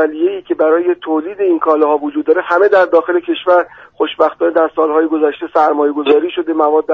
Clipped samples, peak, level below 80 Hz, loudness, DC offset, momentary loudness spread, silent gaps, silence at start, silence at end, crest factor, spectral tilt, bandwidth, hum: under 0.1%; 0 dBFS; -60 dBFS; -13 LUFS; under 0.1%; 6 LU; none; 0 s; 0 s; 12 dB; -6 dB/octave; 5.8 kHz; none